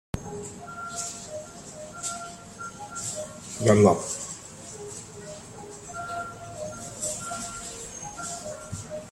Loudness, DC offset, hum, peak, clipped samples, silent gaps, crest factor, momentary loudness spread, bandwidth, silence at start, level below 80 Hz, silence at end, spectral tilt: -30 LUFS; under 0.1%; none; -4 dBFS; under 0.1%; none; 26 dB; 17 LU; 15.5 kHz; 0.15 s; -56 dBFS; 0 s; -4.5 dB/octave